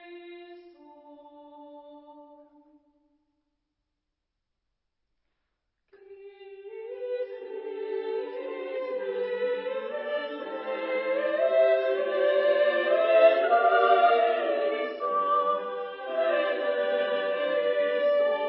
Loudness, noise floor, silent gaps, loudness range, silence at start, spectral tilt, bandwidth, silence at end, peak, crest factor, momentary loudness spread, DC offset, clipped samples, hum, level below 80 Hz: -26 LUFS; -83 dBFS; none; 15 LU; 0 s; -6.5 dB/octave; 5.6 kHz; 0 s; -8 dBFS; 20 dB; 16 LU; under 0.1%; under 0.1%; none; -84 dBFS